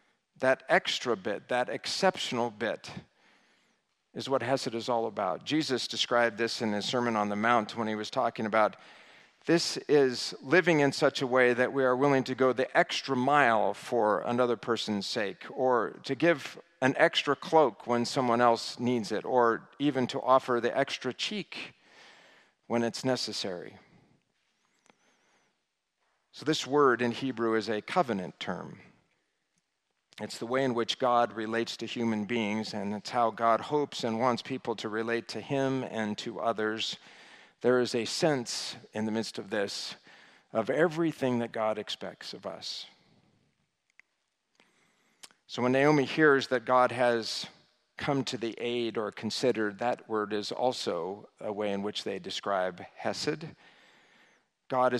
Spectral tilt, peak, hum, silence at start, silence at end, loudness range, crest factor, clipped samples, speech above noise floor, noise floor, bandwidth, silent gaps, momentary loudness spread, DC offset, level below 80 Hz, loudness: -4.5 dB/octave; -8 dBFS; none; 0.4 s; 0 s; 8 LU; 22 dB; under 0.1%; 52 dB; -81 dBFS; 13.5 kHz; none; 12 LU; under 0.1%; -78 dBFS; -29 LUFS